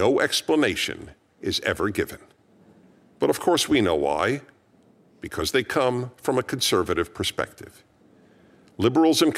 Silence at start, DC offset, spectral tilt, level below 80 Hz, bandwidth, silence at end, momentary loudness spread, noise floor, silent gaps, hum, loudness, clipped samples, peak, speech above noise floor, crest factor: 0 s; under 0.1%; -4 dB/octave; -54 dBFS; 16 kHz; 0 s; 12 LU; -58 dBFS; none; none; -24 LUFS; under 0.1%; -6 dBFS; 35 dB; 18 dB